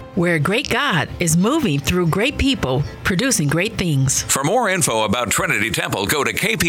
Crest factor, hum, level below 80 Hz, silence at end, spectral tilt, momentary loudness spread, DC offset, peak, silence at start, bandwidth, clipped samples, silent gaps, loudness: 16 dB; none; -38 dBFS; 0 s; -4 dB/octave; 3 LU; under 0.1%; -2 dBFS; 0 s; 18 kHz; under 0.1%; none; -18 LUFS